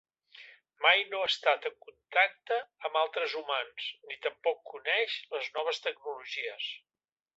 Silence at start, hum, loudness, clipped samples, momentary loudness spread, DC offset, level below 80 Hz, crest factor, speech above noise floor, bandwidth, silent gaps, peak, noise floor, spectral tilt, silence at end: 0.35 s; none; -31 LUFS; under 0.1%; 12 LU; under 0.1%; -86 dBFS; 24 dB; 23 dB; 8 kHz; none; -10 dBFS; -55 dBFS; 0 dB/octave; 0.6 s